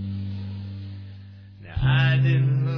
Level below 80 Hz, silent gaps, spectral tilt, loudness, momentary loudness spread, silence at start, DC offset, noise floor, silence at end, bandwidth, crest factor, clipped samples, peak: -42 dBFS; none; -8.5 dB/octave; -23 LUFS; 22 LU; 0 s; under 0.1%; -43 dBFS; 0 s; 5.4 kHz; 14 dB; under 0.1%; -10 dBFS